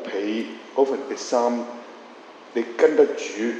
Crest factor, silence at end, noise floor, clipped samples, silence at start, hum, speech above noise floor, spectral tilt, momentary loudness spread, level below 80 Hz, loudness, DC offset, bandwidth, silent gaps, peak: 20 dB; 0 s; -44 dBFS; under 0.1%; 0 s; none; 22 dB; -3.5 dB/octave; 23 LU; -78 dBFS; -23 LUFS; under 0.1%; 8.6 kHz; none; -4 dBFS